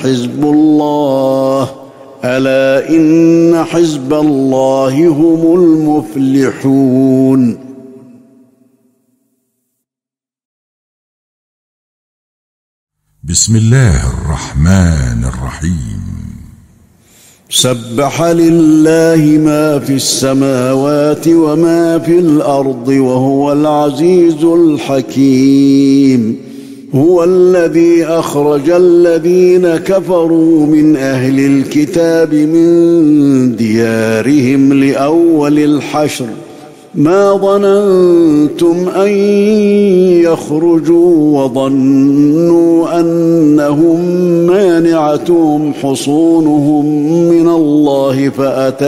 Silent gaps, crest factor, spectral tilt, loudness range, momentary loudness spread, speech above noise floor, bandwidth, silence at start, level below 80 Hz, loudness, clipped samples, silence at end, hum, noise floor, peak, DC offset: 10.45-12.87 s; 10 dB; -6 dB/octave; 5 LU; 7 LU; 80 dB; 15.5 kHz; 0 s; -32 dBFS; -9 LUFS; under 0.1%; 0 s; none; -88 dBFS; 0 dBFS; under 0.1%